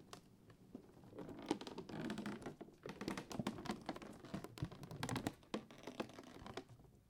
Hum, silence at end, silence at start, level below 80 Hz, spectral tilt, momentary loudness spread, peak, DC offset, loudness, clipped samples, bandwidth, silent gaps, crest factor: none; 0 s; 0 s; -70 dBFS; -5 dB/octave; 14 LU; -22 dBFS; under 0.1%; -49 LUFS; under 0.1%; 17 kHz; none; 28 dB